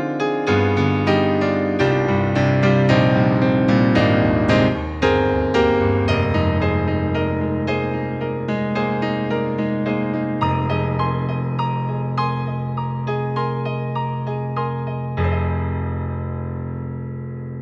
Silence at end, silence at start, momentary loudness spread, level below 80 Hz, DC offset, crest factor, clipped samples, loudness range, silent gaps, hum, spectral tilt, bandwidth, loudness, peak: 0 s; 0 s; 9 LU; -38 dBFS; under 0.1%; 16 dB; under 0.1%; 7 LU; none; none; -8 dB/octave; 7.4 kHz; -20 LUFS; -2 dBFS